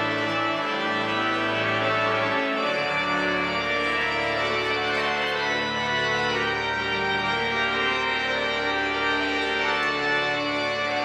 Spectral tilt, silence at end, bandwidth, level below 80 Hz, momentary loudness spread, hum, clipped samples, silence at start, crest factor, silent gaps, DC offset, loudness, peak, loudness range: -4 dB/octave; 0 s; 14.5 kHz; -52 dBFS; 2 LU; none; under 0.1%; 0 s; 14 dB; none; under 0.1%; -24 LUFS; -12 dBFS; 0 LU